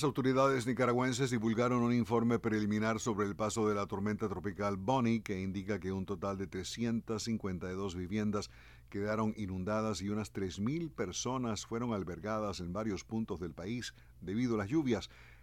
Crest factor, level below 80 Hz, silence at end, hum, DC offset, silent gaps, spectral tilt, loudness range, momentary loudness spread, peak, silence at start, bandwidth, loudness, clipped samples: 18 dB; -60 dBFS; 0 s; none; under 0.1%; none; -6 dB/octave; 6 LU; 9 LU; -18 dBFS; 0 s; 15 kHz; -35 LUFS; under 0.1%